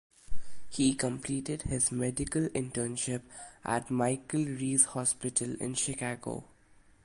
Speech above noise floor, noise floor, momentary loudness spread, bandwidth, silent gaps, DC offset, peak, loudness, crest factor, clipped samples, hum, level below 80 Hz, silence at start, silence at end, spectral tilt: 29 dB; -61 dBFS; 13 LU; 11.5 kHz; none; under 0.1%; -10 dBFS; -31 LUFS; 22 dB; under 0.1%; none; -52 dBFS; 0.3 s; 0.6 s; -4 dB/octave